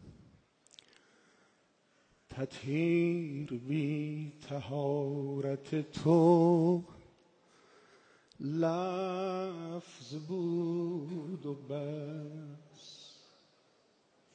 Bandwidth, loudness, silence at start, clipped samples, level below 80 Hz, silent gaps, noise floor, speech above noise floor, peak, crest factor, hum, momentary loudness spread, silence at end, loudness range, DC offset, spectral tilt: 9 kHz; -34 LUFS; 0 s; under 0.1%; -74 dBFS; none; -71 dBFS; 38 dB; -14 dBFS; 22 dB; none; 20 LU; 1.25 s; 8 LU; under 0.1%; -8 dB/octave